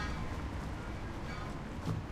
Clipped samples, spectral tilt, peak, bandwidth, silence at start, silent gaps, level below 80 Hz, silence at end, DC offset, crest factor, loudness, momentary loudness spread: under 0.1%; -6 dB/octave; -26 dBFS; 15.5 kHz; 0 s; none; -44 dBFS; 0 s; under 0.1%; 14 dB; -41 LUFS; 3 LU